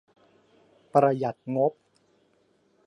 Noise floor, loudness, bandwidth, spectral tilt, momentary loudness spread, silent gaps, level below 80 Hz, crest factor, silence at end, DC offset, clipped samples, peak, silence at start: -66 dBFS; -26 LUFS; 11 kHz; -8.5 dB/octave; 7 LU; none; -78 dBFS; 22 dB; 1.15 s; under 0.1%; under 0.1%; -8 dBFS; 0.95 s